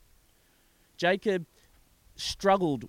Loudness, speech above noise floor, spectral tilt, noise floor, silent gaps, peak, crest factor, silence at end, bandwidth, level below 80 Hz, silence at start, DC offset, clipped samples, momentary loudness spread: -28 LUFS; 37 dB; -4.5 dB/octave; -65 dBFS; none; -12 dBFS; 20 dB; 0 s; 16.5 kHz; -58 dBFS; 1 s; under 0.1%; under 0.1%; 10 LU